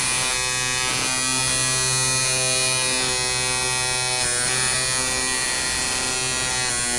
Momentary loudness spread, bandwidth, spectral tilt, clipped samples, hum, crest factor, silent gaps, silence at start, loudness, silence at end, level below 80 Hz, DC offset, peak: 3 LU; 11.5 kHz; -0.5 dB/octave; under 0.1%; none; 14 dB; none; 0 s; -19 LUFS; 0 s; -44 dBFS; under 0.1%; -8 dBFS